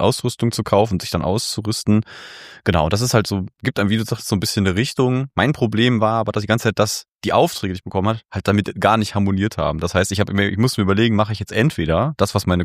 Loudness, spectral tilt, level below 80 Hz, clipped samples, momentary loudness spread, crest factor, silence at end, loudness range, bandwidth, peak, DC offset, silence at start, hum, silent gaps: -19 LUFS; -5.5 dB/octave; -42 dBFS; under 0.1%; 5 LU; 18 dB; 0 s; 2 LU; 15.5 kHz; -2 dBFS; under 0.1%; 0 s; none; 7.08-7.19 s